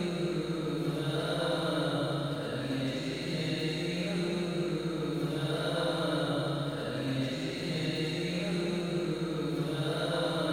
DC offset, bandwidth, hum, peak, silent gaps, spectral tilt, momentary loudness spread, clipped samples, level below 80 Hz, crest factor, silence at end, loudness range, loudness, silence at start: under 0.1%; 16 kHz; none; -18 dBFS; none; -6 dB/octave; 3 LU; under 0.1%; -58 dBFS; 14 dB; 0 s; 1 LU; -32 LUFS; 0 s